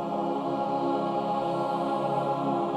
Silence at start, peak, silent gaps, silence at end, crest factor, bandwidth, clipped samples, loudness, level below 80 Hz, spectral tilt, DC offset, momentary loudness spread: 0 s; -16 dBFS; none; 0 s; 12 dB; 12 kHz; under 0.1%; -28 LUFS; -70 dBFS; -7.5 dB/octave; under 0.1%; 2 LU